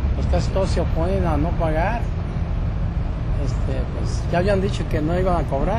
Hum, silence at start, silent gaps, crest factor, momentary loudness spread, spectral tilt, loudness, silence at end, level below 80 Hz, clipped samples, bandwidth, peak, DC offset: none; 0 s; none; 12 dB; 5 LU; -7.5 dB/octave; -22 LUFS; 0 s; -24 dBFS; under 0.1%; 10.5 kHz; -8 dBFS; under 0.1%